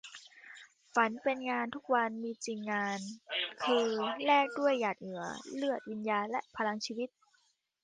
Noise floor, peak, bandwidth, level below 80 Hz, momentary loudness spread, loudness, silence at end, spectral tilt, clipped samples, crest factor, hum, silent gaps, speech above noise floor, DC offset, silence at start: -74 dBFS; -14 dBFS; 9.8 kHz; -80 dBFS; 12 LU; -34 LUFS; 0.75 s; -3.5 dB/octave; under 0.1%; 20 dB; none; none; 41 dB; under 0.1%; 0.05 s